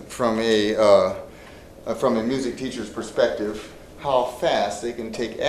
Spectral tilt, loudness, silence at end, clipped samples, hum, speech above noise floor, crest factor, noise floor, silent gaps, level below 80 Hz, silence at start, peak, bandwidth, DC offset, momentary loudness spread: -4.5 dB/octave; -22 LUFS; 0 s; under 0.1%; none; 21 dB; 20 dB; -43 dBFS; none; -50 dBFS; 0 s; -2 dBFS; 14 kHz; under 0.1%; 15 LU